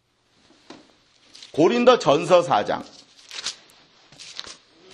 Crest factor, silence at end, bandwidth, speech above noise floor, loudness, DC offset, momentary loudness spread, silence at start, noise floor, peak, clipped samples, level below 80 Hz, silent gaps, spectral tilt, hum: 22 dB; 0.4 s; 11.5 kHz; 44 dB; -20 LUFS; under 0.1%; 25 LU; 0.7 s; -62 dBFS; -2 dBFS; under 0.1%; -66 dBFS; none; -4.5 dB/octave; none